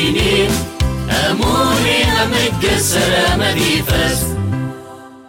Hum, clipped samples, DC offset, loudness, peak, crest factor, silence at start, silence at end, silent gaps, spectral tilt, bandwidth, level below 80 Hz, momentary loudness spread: none; under 0.1%; under 0.1%; -14 LUFS; -4 dBFS; 12 dB; 0 s; 0.05 s; none; -4 dB/octave; 16.5 kHz; -26 dBFS; 7 LU